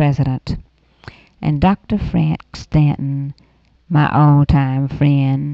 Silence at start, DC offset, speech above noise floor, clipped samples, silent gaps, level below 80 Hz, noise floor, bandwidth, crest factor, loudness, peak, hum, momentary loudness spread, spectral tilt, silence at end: 0 s; under 0.1%; 26 dB; under 0.1%; none; -32 dBFS; -41 dBFS; 6.6 kHz; 14 dB; -16 LUFS; -2 dBFS; none; 13 LU; -9 dB/octave; 0 s